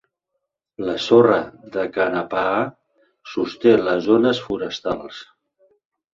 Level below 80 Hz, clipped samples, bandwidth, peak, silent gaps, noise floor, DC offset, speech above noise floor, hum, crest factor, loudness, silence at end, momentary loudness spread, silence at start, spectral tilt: -58 dBFS; under 0.1%; 7.4 kHz; -2 dBFS; none; -78 dBFS; under 0.1%; 59 dB; none; 20 dB; -20 LUFS; 0.9 s; 14 LU; 0.8 s; -6 dB/octave